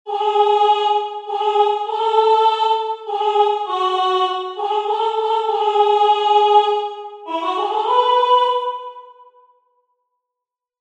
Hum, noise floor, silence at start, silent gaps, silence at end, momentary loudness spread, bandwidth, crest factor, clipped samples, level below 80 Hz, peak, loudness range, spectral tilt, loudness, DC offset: none; -84 dBFS; 0.05 s; none; 1.7 s; 9 LU; 8.8 kHz; 16 dB; under 0.1%; -84 dBFS; -2 dBFS; 4 LU; -0.5 dB/octave; -17 LUFS; under 0.1%